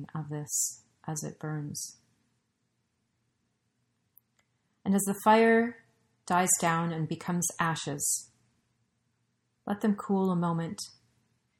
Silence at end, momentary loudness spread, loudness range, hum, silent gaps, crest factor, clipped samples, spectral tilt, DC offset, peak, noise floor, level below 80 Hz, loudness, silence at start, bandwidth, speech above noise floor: 0.7 s; 14 LU; 15 LU; none; none; 20 dB; under 0.1%; -4.5 dB/octave; under 0.1%; -12 dBFS; -78 dBFS; -72 dBFS; -29 LUFS; 0 s; 16 kHz; 49 dB